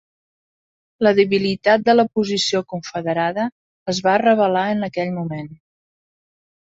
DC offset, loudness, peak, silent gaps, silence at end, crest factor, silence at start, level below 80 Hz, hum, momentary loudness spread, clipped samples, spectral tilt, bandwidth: under 0.1%; -19 LUFS; -2 dBFS; 3.52-3.86 s; 1.2 s; 18 dB; 1 s; -62 dBFS; none; 12 LU; under 0.1%; -5 dB/octave; 8 kHz